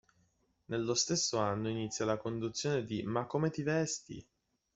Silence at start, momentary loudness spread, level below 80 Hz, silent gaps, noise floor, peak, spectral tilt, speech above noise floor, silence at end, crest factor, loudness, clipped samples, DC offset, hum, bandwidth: 0.7 s; 7 LU; -68 dBFS; none; -74 dBFS; -16 dBFS; -4 dB/octave; 40 dB; 0.55 s; 20 dB; -34 LUFS; under 0.1%; under 0.1%; none; 8.2 kHz